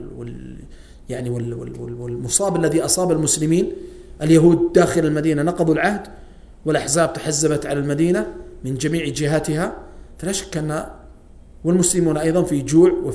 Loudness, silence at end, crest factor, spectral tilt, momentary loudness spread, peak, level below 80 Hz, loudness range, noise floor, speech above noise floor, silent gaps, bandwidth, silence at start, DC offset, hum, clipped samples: -19 LUFS; 0 s; 18 dB; -5 dB/octave; 17 LU; -2 dBFS; -42 dBFS; 5 LU; -43 dBFS; 24 dB; none; 11 kHz; 0 s; under 0.1%; none; under 0.1%